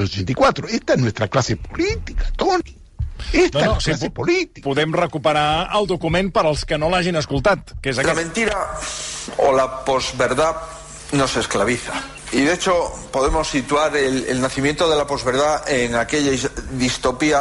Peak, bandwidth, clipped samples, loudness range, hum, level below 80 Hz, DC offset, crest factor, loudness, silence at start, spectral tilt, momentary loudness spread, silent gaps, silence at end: -6 dBFS; 11.5 kHz; under 0.1%; 2 LU; none; -34 dBFS; under 0.1%; 14 dB; -19 LUFS; 0 s; -4.5 dB/octave; 7 LU; none; 0 s